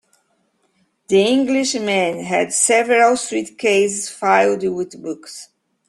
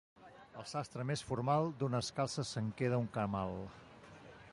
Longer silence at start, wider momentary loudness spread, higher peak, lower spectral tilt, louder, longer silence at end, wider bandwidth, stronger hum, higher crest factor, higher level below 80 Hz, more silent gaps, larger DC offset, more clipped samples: first, 1.1 s vs 0.2 s; second, 14 LU vs 21 LU; first, -2 dBFS vs -20 dBFS; second, -3 dB/octave vs -6 dB/octave; first, -17 LUFS vs -38 LUFS; first, 0.45 s vs 0 s; about the same, 12.5 kHz vs 11.5 kHz; neither; about the same, 16 dB vs 18 dB; about the same, -64 dBFS vs -64 dBFS; neither; neither; neither